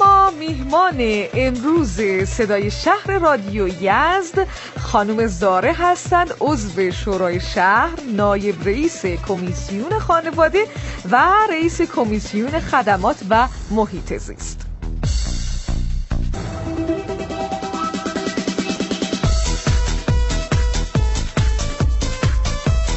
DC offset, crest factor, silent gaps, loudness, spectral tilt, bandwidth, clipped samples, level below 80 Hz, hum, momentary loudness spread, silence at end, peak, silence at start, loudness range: under 0.1%; 16 dB; none; -19 LUFS; -5.5 dB/octave; 8.4 kHz; under 0.1%; -26 dBFS; none; 10 LU; 0 s; -2 dBFS; 0 s; 7 LU